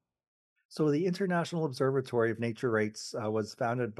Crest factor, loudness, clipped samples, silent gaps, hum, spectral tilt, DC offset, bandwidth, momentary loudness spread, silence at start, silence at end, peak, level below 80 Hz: 16 dB; -31 LUFS; under 0.1%; none; none; -6.5 dB/octave; under 0.1%; 12.5 kHz; 5 LU; 0.7 s; 0.05 s; -16 dBFS; -78 dBFS